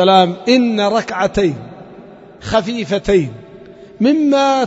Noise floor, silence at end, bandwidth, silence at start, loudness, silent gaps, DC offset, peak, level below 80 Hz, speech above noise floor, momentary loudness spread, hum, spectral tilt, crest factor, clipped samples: -38 dBFS; 0 s; 8 kHz; 0 s; -15 LUFS; none; under 0.1%; 0 dBFS; -42 dBFS; 24 dB; 15 LU; none; -5.5 dB/octave; 16 dB; under 0.1%